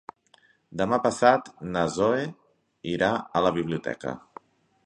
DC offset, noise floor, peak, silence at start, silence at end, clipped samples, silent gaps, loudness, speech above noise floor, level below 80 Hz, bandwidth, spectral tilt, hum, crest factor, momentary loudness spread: under 0.1%; -62 dBFS; -4 dBFS; 0.7 s; 0.7 s; under 0.1%; none; -26 LUFS; 37 dB; -58 dBFS; 10.5 kHz; -5.5 dB/octave; none; 24 dB; 15 LU